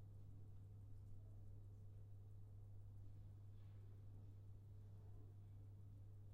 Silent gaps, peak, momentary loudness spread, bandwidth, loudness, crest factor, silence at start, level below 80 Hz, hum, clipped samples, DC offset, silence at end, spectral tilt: none; -48 dBFS; 1 LU; 4.4 kHz; -62 LUFS; 10 dB; 0 s; -66 dBFS; none; under 0.1%; under 0.1%; 0 s; -8.5 dB/octave